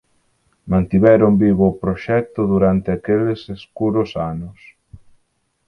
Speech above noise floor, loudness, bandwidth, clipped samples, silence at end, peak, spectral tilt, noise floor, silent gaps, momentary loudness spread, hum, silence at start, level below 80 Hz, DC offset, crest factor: 50 dB; -17 LUFS; 5.8 kHz; under 0.1%; 0.7 s; 0 dBFS; -10 dB/octave; -66 dBFS; none; 13 LU; none; 0.65 s; -40 dBFS; under 0.1%; 18 dB